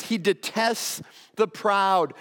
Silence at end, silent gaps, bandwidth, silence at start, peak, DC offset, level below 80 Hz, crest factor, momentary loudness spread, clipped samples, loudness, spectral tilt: 0 s; none; 18 kHz; 0 s; -8 dBFS; under 0.1%; -78 dBFS; 16 dB; 10 LU; under 0.1%; -24 LUFS; -3 dB/octave